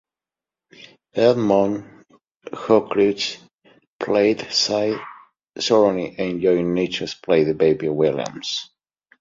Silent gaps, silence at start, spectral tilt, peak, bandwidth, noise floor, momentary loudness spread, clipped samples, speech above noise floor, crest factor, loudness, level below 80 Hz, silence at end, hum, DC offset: 2.36-2.40 s, 3.87-3.99 s; 0.8 s; -5 dB/octave; -2 dBFS; 7.6 kHz; -90 dBFS; 13 LU; under 0.1%; 71 dB; 18 dB; -20 LUFS; -58 dBFS; 0.55 s; none; under 0.1%